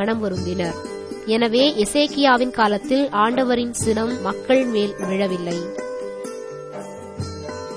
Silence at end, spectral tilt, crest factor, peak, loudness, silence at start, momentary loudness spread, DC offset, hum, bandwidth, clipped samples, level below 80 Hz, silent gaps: 0 s; -4.5 dB/octave; 18 dB; -4 dBFS; -20 LUFS; 0 s; 15 LU; 0.1%; none; 11 kHz; under 0.1%; -50 dBFS; none